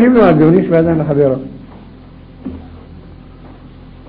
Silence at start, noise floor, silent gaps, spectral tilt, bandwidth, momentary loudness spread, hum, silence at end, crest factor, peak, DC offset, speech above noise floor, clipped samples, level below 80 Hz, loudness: 0 s; -36 dBFS; none; -12 dB/octave; 5 kHz; 24 LU; none; 0.4 s; 14 dB; 0 dBFS; under 0.1%; 26 dB; under 0.1%; -38 dBFS; -11 LUFS